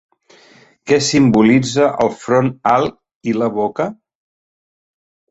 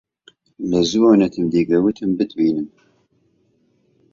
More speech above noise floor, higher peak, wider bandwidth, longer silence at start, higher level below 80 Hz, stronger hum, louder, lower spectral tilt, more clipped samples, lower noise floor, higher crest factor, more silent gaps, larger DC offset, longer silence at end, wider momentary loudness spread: second, 34 dB vs 45 dB; about the same, -2 dBFS vs -2 dBFS; first, 8.2 kHz vs 7.4 kHz; first, 0.85 s vs 0.6 s; about the same, -52 dBFS vs -54 dBFS; neither; about the same, -15 LUFS vs -17 LUFS; about the same, -5.5 dB/octave vs -6.5 dB/octave; neither; second, -48 dBFS vs -62 dBFS; about the same, 16 dB vs 18 dB; first, 3.15-3.21 s vs none; neither; about the same, 1.35 s vs 1.45 s; about the same, 12 LU vs 11 LU